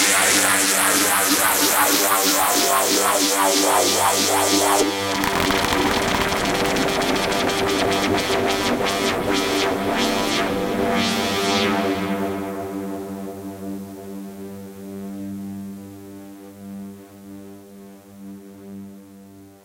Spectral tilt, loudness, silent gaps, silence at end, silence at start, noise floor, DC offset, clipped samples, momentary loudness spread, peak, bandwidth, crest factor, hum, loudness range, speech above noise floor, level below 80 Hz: -2 dB/octave; -18 LUFS; none; 0.15 s; 0 s; -44 dBFS; under 0.1%; under 0.1%; 22 LU; -2 dBFS; 17 kHz; 20 dB; none; 20 LU; 26 dB; -46 dBFS